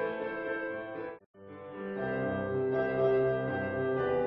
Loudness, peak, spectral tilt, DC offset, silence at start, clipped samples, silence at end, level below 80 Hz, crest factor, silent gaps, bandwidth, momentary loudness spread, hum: -32 LUFS; -16 dBFS; -10.5 dB/octave; under 0.1%; 0 s; under 0.1%; 0 s; -60 dBFS; 16 dB; 1.26-1.34 s; 5 kHz; 16 LU; none